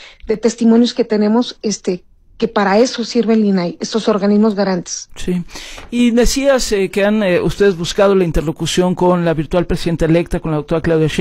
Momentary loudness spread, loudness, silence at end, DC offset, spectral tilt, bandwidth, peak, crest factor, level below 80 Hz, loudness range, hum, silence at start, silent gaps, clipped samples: 9 LU; -15 LUFS; 0 s; under 0.1%; -5.5 dB/octave; 15.5 kHz; -2 dBFS; 12 dB; -30 dBFS; 2 LU; none; 0 s; none; under 0.1%